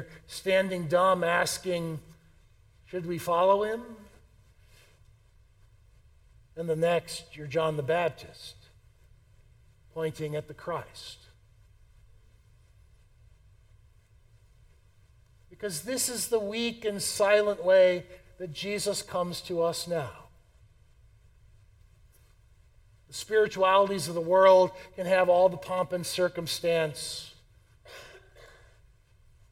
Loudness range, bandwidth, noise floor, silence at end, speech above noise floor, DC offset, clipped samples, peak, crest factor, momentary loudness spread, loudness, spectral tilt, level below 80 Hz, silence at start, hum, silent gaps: 15 LU; 16.5 kHz; -60 dBFS; 1.05 s; 33 dB; under 0.1%; under 0.1%; -8 dBFS; 22 dB; 19 LU; -27 LUFS; -4 dB/octave; -60 dBFS; 0 s; none; none